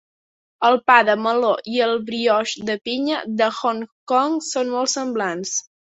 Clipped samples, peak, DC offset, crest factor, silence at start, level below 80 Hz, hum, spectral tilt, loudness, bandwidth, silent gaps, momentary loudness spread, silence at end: under 0.1%; -2 dBFS; under 0.1%; 18 dB; 0.6 s; -68 dBFS; none; -2.5 dB/octave; -20 LUFS; 8.4 kHz; 3.92-4.07 s; 10 LU; 0.25 s